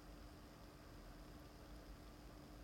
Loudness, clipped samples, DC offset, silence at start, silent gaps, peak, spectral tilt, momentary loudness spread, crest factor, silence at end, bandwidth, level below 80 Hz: -60 LUFS; under 0.1%; under 0.1%; 0 s; none; -46 dBFS; -5 dB/octave; 1 LU; 12 dB; 0 s; 16.5 kHz; -62 dBFS